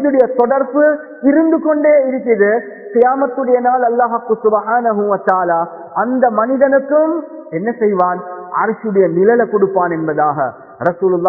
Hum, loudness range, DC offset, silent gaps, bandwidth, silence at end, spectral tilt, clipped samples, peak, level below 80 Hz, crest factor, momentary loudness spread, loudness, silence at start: none; 2 LU; under 0.1%; none; 2.7 kHz; 0 s; -11.5 dB/octave; under 0.1%; 0 dBFS; -60 dBFS; 14 dB; 8 LU; -14 LUFS; 0 s